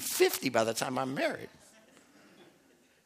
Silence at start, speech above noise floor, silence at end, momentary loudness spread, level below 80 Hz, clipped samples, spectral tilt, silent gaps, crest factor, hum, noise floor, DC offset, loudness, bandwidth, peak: 0 s; 33 dB; 0.65 s; 12 LU; -78 dBFS; under 0.1%; -3 dB/octave; none; 22 dB; none; -65 dBFS; under 0.1%; -31 LUFS; 15.5 kHz; -12 dBFS